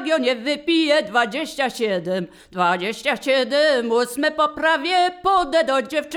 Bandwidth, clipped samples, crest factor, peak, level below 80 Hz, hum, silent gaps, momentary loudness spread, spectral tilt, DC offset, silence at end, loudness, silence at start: 19 kHz; under 0.1%; 16 dB; -4 dBFS; -56 dBFS; none; none; 6 LU; -3.5 dB/octave; under 0.1%; 0 s; -20 LUFS; 0 s